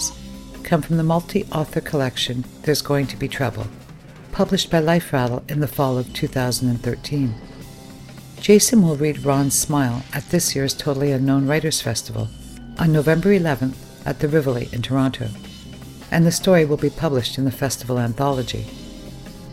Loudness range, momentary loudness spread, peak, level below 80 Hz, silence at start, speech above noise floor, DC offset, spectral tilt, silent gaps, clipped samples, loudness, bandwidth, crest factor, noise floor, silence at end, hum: 4 LU; 20 LU; -2 dBFS; -42 dBFS; 0 s; 21 dB; under 0.1%; -5 dB/octave; none; under 0.1%; -20 LUFS; 16.5 kHz; 20 dB; -40 dBFS; 0 s; none